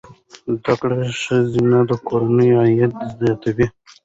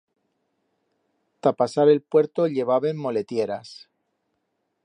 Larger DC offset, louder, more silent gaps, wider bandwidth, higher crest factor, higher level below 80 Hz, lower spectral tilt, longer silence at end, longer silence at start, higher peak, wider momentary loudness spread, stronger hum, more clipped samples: neither; first, -18 LUFS vs -22 LUFS; neither; second, 8 kHz vs 10 kHz; about the same, 14 dB vs 18 dB; first, -50 dBFS vs -74 dBFS; about the same, -7.5 dB/octave vs -7 dB/octave; second, 0.35 s vs 1.1 s; second, 0.1 s vs 1.45 s; about the same, -4 dBFS vs -6 dBFS; about the same, 8 LU vs 10 LU; neither; neither